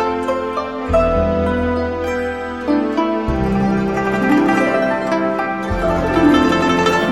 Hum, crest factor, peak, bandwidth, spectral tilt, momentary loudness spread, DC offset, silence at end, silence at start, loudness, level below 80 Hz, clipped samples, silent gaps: none; 16 dB; 0 dBFS; 14 kHz; -6.5 dB/octave; 7 LU; 0.3%; 0 s; 0 s; -17 LUFS; -30 dBFS; under 0.1%; none